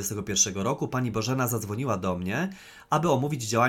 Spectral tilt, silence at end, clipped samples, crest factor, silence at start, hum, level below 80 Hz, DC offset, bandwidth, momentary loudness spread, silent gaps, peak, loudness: -4 dB/octave; 0 s; under 0.1%; 18 dB; 0 s; none; -56 dBFS; under 0.1%; 17.5 kHz; 6 LU; none; -8 dBFS; -27 LUFS